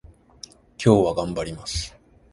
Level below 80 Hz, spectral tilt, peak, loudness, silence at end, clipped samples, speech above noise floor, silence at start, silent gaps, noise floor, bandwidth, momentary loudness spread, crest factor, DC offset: -42 dBFS; -6 dB/octave; -2 dBFS; -23 LUFS; 0.45 s; under 0.1%; 26 dB; 0.8 s; none; -47 dBFS; 11.5 kHz; 25 LU; 22 dB; under 0.1%